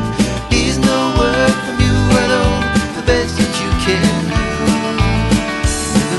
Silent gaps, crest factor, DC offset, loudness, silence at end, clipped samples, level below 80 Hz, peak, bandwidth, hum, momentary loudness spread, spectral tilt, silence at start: none; 14 dB; under 0.1%; -15 LUFS; 0 s; under 0.1%; -24 dBFS; 0 dBFS; 12 kHz; none; 4 LU; -5 dB/octave; 0 s